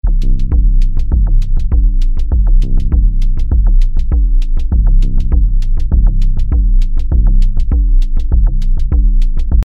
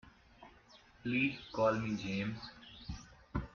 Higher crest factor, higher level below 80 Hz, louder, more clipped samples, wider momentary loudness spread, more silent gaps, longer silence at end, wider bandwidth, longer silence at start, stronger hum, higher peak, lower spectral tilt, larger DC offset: second, 8 dB vs 20 dB; first, -8 dBFS vs -56 dBFS; first, -16 LUFS vs -37 LUFS; neither; second, 3 LU vs 17 LU; neither; about the same, 0 s vs 0.05 s; second, 1.4 kHz vs 7.2 kHz; about the same, 0.05 s vs 0.05 s; neither; first, 0 dBFS vs -20 dBFS; first, -9 dB/octave vs -4.5 dB/octave; neither